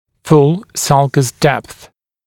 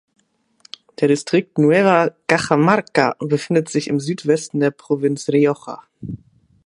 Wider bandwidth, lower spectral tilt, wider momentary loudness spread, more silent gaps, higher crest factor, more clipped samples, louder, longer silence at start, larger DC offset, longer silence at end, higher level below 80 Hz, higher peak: first, 17 kHz vs 11.5 kHz; about the same, -5.5 dB/octave vs -6 dB/octave; second, 6 LU vs 18 LU; neither; about the same, 14 dB vs 18 dB; neither; first, -13 LUFS vs -18 LUFS; second, 0.25 s vs 1 s; neither; about the same, 0.55 s vs 0.5 s; first, -48 dBFS vs -58 dBFS; about the same, 0 dBFS vs 0 dBFS